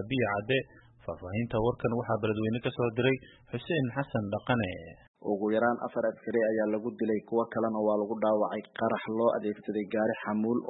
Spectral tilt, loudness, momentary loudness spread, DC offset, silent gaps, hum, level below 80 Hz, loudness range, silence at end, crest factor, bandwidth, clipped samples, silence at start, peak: -10.5 dB/octave; -30 LUFS; 8 LU; under 0.1%; 5.08-5.14 s; none; -60 dBFS; 2 LU; 0 s; 16 dB; 4.1 kHz; under 0.1%; 0 s; -14 dBFS